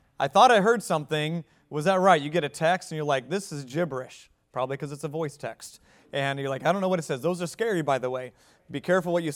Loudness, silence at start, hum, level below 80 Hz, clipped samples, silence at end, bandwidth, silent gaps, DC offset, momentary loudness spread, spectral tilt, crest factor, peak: -26 LUFS; 0.2 s; none; -70 dBFS; under 0.1%; 0 s; 16.5 kHz; none; under 0.1%; 16 LU; -5 dB/octave; 22 dB; -4 dBFS